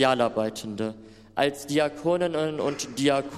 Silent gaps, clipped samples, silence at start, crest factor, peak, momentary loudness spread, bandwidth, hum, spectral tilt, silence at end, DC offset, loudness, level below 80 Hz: none; under 0.1%; 0 s; 18 dB; -8 dBFS; 9 LU; 15.5 kHz; none; -4.5 dB/octave; 0 s; under 0.1%; -27 LUFS; -60 dBFS